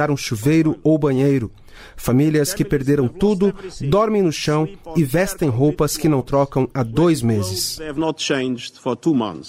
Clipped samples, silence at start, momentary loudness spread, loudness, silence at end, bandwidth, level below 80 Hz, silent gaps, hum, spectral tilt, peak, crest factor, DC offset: under 0.1%; 0 s; 6 LU; -19 LUFS; 0 s; 16 kHz; -40 dBFS; none; none; -6 dB/octave; -6 dBFS; 12 dB; under 0.1%